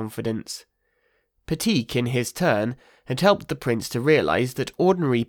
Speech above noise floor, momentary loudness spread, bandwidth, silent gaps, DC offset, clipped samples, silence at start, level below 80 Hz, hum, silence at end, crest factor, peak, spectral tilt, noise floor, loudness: 46 dB; 12 LU; 19.5 kHz; none; under 0.1%; under 0.1%; 0 s; -54 dBFS; none; 0.05 s; 18 dB; -4 dBFS; -5.5 dB/octave; -69 dBFS; -23 LUFS